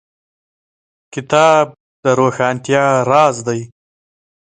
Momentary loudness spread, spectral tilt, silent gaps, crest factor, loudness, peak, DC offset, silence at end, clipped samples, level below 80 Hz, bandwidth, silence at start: 12 LU; -5 dB/octave; 1.80-2.03 s; 16 dB; -14 LUFS; 0 dBFS; under 0.1%; 0.9 s; under 0.1%; -60 dBFS; 9.4 kHz; 1.15 s